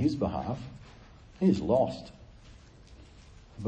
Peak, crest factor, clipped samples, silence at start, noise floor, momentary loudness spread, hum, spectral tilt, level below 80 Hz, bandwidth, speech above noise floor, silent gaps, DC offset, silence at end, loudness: -12 dBFS; 20 dB; under 0.1%; 0 s; -53 dBFS; 24 LU; none; -8.5 dB/octave; -52 dBFS; 8.6 kHz; 24 dB; none; under 0.1%; 0 s; -29 LUFS